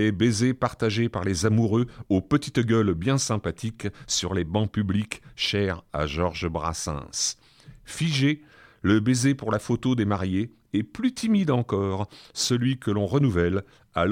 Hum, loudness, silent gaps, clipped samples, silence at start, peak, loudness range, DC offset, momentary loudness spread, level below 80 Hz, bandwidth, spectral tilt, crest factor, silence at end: none; -25 LUFS; none; under 0.1%; 0 s; -8 dBFS; 3 LU; under 0.1%; 8 LU; -48 dBFS; 16 kHz; -5 dB/octave; 18 dB; 0 s